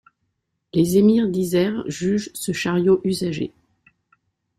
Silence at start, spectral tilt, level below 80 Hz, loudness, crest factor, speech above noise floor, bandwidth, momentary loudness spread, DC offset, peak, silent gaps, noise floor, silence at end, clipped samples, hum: 0.75 s; -6 dB/octave; -56 dBFS; -20 LUFS; 16 dB; 55 dB; 16 kHz; 10 LU; under 0.1%; -6 dBFS; none; -74 dBFS; 1.1 s; under 0.1%; none